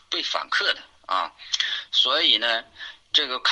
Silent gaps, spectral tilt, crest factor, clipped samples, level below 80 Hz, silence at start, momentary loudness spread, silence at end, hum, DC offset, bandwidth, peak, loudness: none; 1 dB/octave; 20 dB; under 0.1%; -68 dBFS; 0.1 s; 10 LU; 0 s; none; under 0.1%; 11 kHz; -4 dBFS; -22 LUFS